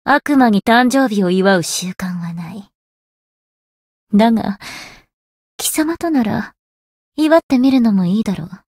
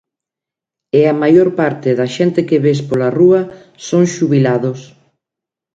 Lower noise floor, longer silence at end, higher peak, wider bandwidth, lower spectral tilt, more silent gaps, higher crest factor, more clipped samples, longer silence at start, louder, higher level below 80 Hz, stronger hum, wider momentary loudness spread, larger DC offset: first, under -90 dBFS vs -86 dBFS; second, 0.15 s vs 0.9 s; about the same, 0 dBFS vs 0 dBFS; first, 16.5 kHz vs 7.8 kHz; second, -5 dB/octave vs -7 dB/octave; first, 2.75-4.07 s, 5.14-5.58 s, 6.59-7.12 s, 7.43-7.49 s vs none; about the same, 16 dB vs 14 dB; neither; second, 0.05 s vs 0.95 s; about the same, -15 LUFS vs -13 LUFS; about the same, -52 dBFS vs -56 dBFS; neither; first, 17 LU vs 7 LU; neither